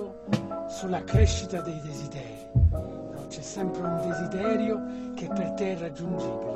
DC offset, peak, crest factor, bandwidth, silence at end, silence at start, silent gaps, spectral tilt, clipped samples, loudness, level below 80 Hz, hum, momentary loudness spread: under 0.1%; -10 dBFS; 20 dB; 11.5 kHz; 0 s; 0 s; none; -6.5 dB/octave; under 0.1%; -29 LUFS; -36 dBFS; none; 12 LU